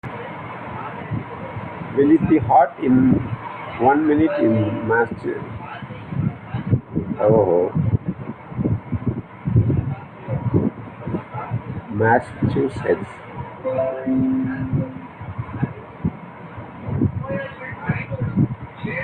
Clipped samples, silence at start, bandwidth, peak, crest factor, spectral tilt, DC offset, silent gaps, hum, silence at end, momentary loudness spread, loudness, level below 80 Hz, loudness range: under 0.1%; 0.05 s; 9 kHz; -2 dBFS; 18 dB; -10 dB/octave; under 0.1%; none; none; 0 s; 16 LU; -21 LUFS; -46 dBFS; 8 LU